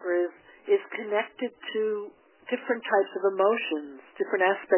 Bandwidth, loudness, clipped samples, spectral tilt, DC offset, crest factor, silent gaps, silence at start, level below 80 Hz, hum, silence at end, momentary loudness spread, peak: 3.2 kHz; -28 LUFS; under 0.1%; -7.5 dB/octave; under 0.1%; 18 dB; none; 0 s; -82 dBFS; none; 0 s; 10 LU; -10 dBFS